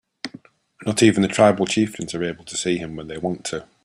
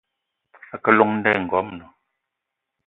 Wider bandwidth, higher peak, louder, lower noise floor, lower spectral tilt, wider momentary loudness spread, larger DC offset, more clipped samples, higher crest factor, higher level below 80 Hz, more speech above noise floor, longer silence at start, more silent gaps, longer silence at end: first, 14 kHz vs 4.1 kHz; about the same, -2 dBFS vs 0 dBFS; about the same, -21 LUFS vs -19 LUFS; second, -48 dBFS vs -82 dBFS; second, -4.5 dB/octave vs -9 dB/octave; second, 15 LU vs 20 LU; neither; neither; about the same, 20 dB vs 22 dB; about the same, -56 dBFS vs -60 dBFS; second, 28 dB vs 62 dB; second, 0.25 s vs 0.75 s; neither; second, 0.2 s vs 1.05 s